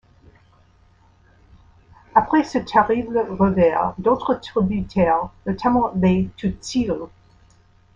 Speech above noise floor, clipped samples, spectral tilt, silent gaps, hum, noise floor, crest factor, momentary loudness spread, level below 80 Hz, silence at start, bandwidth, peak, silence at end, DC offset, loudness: 35 dB; under 0.1%; -7 dB/octave; none; none; -55 dBFS; 20 dB; 8 LU; -44 dBFS; 2.15 s; 7.8 kHz; -2 dBFS; 0.9 s; under 0.1%; -20 LUFS